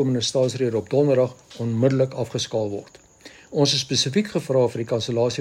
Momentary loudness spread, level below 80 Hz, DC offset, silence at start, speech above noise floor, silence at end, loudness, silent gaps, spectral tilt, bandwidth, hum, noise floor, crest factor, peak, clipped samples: 7 LU; -62 dBFS; under 0.1%; 0 s; 26 dB; 0 s; -22 LUFS; none; -5 dB/octave; 14 kHz; none; -47 dBFS; 16 dB; -6 dBFS; under 0.1%